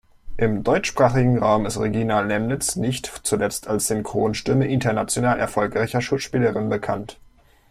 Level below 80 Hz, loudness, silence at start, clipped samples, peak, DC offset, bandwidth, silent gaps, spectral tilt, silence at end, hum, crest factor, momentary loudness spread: -44 dBFS; -22 LUFS; 0.25 s; under 0.1%; -4 dBFS; under 0.1%; 15.5 kHz; none; -5 dB/octave; 0.6 s; none; 18 dB; 6 LU